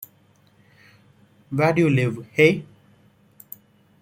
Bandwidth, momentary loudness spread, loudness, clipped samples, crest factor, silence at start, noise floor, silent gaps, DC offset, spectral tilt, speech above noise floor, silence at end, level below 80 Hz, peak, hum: 16.5 kHz; 24 LU; -20 LUFS; under 0.1%; 22 dB; 1.5 s; -58 dBFS; none; under 0.1%; -7 dB/octave; 39 dB; 1.4 s; -62 dBFS; -2 dBFS; none